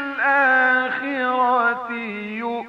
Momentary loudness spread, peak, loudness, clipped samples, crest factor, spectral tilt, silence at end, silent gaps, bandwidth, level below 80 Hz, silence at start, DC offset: 12 LU; -6 dBFS; -19 LUFS; under 0.1%; 14 dB; -5.5 dB/octave; 0 s; none; 7.2 kHz; -70 dBFS; 0 s; under 0.1%